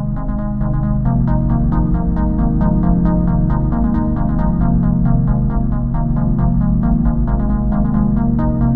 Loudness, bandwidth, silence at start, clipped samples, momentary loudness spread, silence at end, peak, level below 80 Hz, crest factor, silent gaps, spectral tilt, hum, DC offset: -16 LUFS; 2.2 kHz; 0 s; under 0.1%; 3 LU; 0 s; -2 dBFS; -18 dBFS; 12 dB; none; -13.5 dB/octave; none; 4%